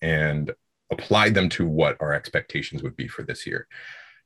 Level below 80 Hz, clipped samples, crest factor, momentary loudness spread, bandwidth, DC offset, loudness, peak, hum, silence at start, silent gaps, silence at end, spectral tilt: -46 dBFS; under 0.1%; 20 dB; 16 LU; 12.5 kHz; under 0.1%; -24 LUFS; -4 dBFS; none; 0 s; none; 0.2 s; -5.5 dB/octave